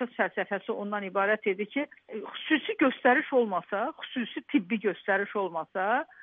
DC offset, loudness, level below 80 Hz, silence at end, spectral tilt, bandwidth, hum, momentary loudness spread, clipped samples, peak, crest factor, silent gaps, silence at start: under 0.1%; -29 LUFS; -86 dBFS; 0 s; -2.5 dB/octave; 3.9 kHz; none; 10 LU; under 0.1%; -10 dBFS; 20 dB; none; 0 s